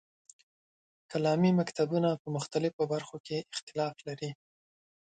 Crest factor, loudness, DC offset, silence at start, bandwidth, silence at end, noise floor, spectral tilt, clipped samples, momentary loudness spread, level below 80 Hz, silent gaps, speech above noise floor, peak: 18 dB; -32 LUFS; under 0.1%; 1.1 s; 9.4 kHz; 0.75 s; under -90 dBFS; -6.5 dB/octave; under 0.1%; 12 LU; -74 dBFS; 2.20-2.25 s, 2.73-2.79 s, 3.20-3.24 s, 3.62-3.67 s; over 59 dB; -16 dBFS